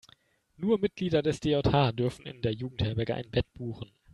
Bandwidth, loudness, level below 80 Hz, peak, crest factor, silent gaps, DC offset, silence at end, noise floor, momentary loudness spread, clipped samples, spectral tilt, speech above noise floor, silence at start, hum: 11.5 kHz; -30 LUFS; -50 dBFS; -10 dBFS; 20 dB; none; under 0.1%; 0.3 s; -63 dBFS; 11 LU; under 0.1%; -7 dB/octave; 34 dB; 0.6 s; none